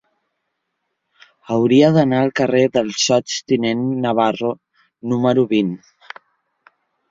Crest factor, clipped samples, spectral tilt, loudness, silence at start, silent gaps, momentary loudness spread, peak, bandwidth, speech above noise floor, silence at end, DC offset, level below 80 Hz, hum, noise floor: 18 dB; under 0.1%; -5 dB/octave; -17 LUFS; 1.5 s; none; 20 LU; -2 dBFS; 7.8 kHz; 58 dB; 1.35 s; under 0.1%; -60 dBFS; none; -75 dBFS